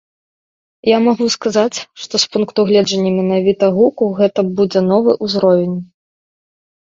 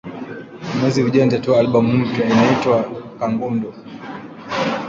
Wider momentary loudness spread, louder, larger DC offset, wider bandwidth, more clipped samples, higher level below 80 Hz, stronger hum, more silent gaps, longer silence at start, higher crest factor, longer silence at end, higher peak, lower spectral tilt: second, 6 LU vs 18 LU; first, -14 LUFS vs -17 LUFS; neither; about the same, 7.8 kHz vs 7.6 kHz; neither; about the same, -58 dBFS vs -54 dBFS; neither; neither; first, 0.85 s vs 0.05 s; about the same, 14 dB vs 16 dB; first, 1 s vs 0 s; about the same, 0 dBFS vs -2 dBFS; second, -5.5 dB/octave vs -7 dB/octave